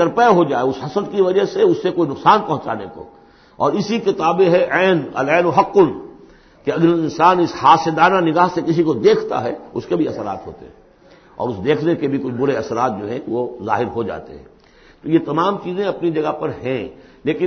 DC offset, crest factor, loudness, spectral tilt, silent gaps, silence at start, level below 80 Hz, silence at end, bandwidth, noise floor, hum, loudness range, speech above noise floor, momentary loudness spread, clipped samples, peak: under 0.1%; 16 dB; -17 LUFS; -6.5 dB/octave; none; 0 s; -52 dBFS; 0 s; 6.6 kHz; -48 dBFS; none; 7 LU; 32 dB; 13 LU; under 0.1%; 0 dBFS